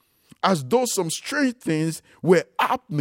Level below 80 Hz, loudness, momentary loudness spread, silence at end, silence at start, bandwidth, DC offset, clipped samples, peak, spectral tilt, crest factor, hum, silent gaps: -68 dBFS; -23 LUFS; 5 LU; 0 s; 0.45 s; 16.5 kHz; under 0.1%; under 0.1%; -4 dBFS; -4.5 dB/octave; 18 dB; none; none